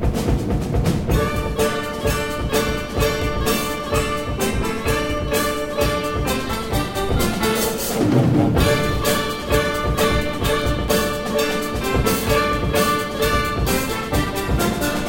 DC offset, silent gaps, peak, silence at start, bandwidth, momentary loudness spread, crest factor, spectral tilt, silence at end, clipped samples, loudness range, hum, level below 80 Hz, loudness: under 0.1%; none; -4 dBFS; 0 s; 17 kHz; 4 LU; 16 dB; -5 dB/octave; 0 s; under 0.1%; 3 LU; none; -28 dBFS; -20 LUFS